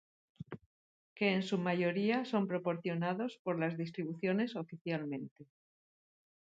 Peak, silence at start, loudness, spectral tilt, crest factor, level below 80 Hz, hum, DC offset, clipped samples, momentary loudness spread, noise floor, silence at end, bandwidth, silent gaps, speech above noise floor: -18 dBFS; 0.4 s; -36 LUFS; -7.5 dB/octave; 20 dB; -80 dBFS; none; under 0.1%; under 0.1%; 17 LU; under -90 dBFS; 1.05 s; 7.8 kHz; 0.66-1.16 s, 3.39-3.45 s, 4.81-4.85 s, 5.31-5.36 s; over 55 dB